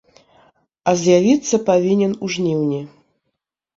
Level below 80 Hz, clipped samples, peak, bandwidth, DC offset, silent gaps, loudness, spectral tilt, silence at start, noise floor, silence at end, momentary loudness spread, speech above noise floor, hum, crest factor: -60 dBFS; under 0.1%; -2 dBFS; 7.8 kHz; under 0.1%; none; -17 LUFS; -5.5 dB/octave; 0.85 s; -76 dBFS; 0.9 s; 10 LU; 60 dB; none; 16 dB